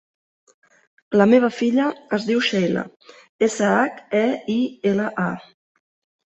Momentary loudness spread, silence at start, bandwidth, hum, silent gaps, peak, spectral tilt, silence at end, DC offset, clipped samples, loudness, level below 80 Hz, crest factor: 10 LU; 1.1 s; 8.2 kHz; none; 3.29-3.39 s; -2 dBFS; -5.5 dB/octave; 0.9 s; under 0.1%; under 0.1%; -20 LUFS; -64 dBFS; 18 dB